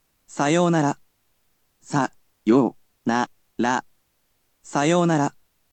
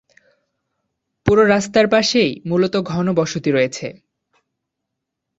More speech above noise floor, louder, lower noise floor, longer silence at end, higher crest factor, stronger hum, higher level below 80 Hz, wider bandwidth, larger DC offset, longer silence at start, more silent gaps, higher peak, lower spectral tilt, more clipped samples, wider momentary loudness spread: second, 49 dB vs 63 dB; second, -23 LUFS vs -17 LUFS; second, -69 dBFS vs -79 dBFS; second, 0.45 s vs 1.45 s; about the same, 18 dB vs 18 dB; neither; second, -70 dBFS vs -48 dBFS; first, 9 kHz vs 8 kHz; neither; second, 0.35 s vs 1.25 s; neither; second, -6 dBFS vs 0 dBFS; about the same, -5.5 dB/octave vs -5 dB/octave; neither; about the same, 10 LU vs 8 LU